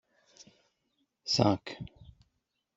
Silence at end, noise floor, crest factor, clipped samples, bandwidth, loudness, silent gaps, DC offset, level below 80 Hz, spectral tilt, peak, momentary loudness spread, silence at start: 0.75 s; -80 dBFS; 28 dB; under 0.1%; 8 kHz; -29 LUFS; none; under 0.1%; -64 dBFS; -5 dB/octave; -8 dBFS; 19 LU; 1.25 s